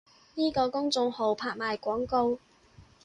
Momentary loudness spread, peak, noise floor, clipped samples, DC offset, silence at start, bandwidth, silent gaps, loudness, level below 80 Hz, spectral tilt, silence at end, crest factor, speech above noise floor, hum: 4 LU; -14 dBFS; -57 dBFS; under 0.1%; under 0.1%; 0.35 s; 11 kHz; none; -29 LUFS; -60 dBFS; -4 dB/octave; 0.25 s; 16 dB; 29 dB; none